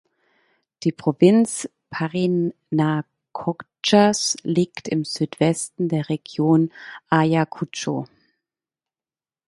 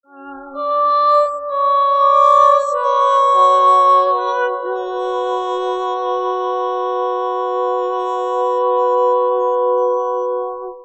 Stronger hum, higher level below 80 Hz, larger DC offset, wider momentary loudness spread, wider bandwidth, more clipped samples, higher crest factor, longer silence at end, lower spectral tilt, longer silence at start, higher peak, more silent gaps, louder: neither; about the same, -64 dBFS vs -60 dBFS; neither; first, 13 LU vs 10 LU; first, 11.5 kHz vs 8.2 kHz; neither; first, 20 dB vs 14 dB; first, 1.45 s vs 0 s; first, -5.5 dB/octave vs -2 dB/octave; first, 0.8 s vs 0.15 s; about the same, -2 dBFS vs 0 dBFS; neither; second, -21 LUFS vs -15 LUFS